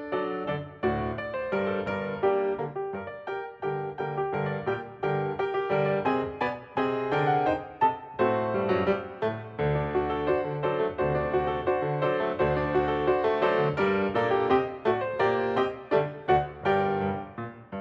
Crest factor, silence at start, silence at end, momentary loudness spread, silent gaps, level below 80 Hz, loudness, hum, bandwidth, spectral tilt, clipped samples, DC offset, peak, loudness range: 18 dB; 0 s; 0 s; 7 LU; none; -50 dBFS; -28 LUFS; none; 6 kHz; -8.5 dB/octave; under 0.1%; under 0.1%; -10 dBFS; 5 LU